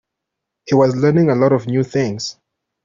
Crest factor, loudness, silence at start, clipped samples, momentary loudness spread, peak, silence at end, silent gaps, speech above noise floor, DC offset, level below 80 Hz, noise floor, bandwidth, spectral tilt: 14 dB; -16 LUFS; 0.65 s; under 0.1%; 9 LU; -2 dBFS; 0.5 s; none; 65 dB; under 0.1%; -54 dBFS; -80 dBFS; 7.6 kHz; -7 dB/octave